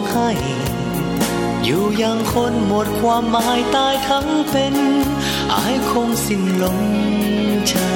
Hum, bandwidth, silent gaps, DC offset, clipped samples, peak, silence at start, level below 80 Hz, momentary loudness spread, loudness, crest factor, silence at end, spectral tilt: none; 17 kHz; none; under 0.1%; under 0.1%; -6 dBFS; 0 s; -38 dBFS; 3 LU; -18 LUFS; 12 dB; 0 s; -4.5 dB/octave